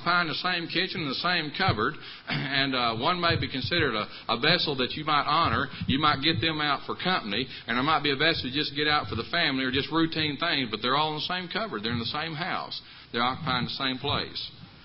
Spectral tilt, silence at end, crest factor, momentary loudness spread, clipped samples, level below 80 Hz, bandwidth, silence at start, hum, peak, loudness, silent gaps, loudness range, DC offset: -9 dB/octave; 0 s; 20 dB; 7 LU; under 0.1%; -52 dBFS; 5.8 kHz; 0 s; none; -8 dBFS; -26 LUFS; none; 4 LU; under 0.1%